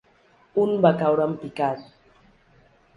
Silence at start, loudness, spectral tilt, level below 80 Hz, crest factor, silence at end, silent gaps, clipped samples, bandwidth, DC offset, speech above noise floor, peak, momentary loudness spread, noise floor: 0.55 s; -23 LUFS; -8.5 dB/octave; -64 dBFS; 20 dB; 1.15 s; none; under 0.1%; 11 kHz; under 0.1%; 37 dB; -4 dBFS; 9 LU; -59 dBFS